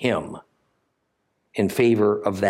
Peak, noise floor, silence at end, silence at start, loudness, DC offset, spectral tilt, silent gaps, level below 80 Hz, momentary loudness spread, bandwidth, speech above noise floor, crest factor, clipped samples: -6 dBFS; -73 dBFS; 0 s; 0 s; -21 LUFS; under 0.1%; -6.5 dB/octave; none; -64 dBFS; 19 LU; 16 kHz; 52 dB; 16 dB; under 0.1%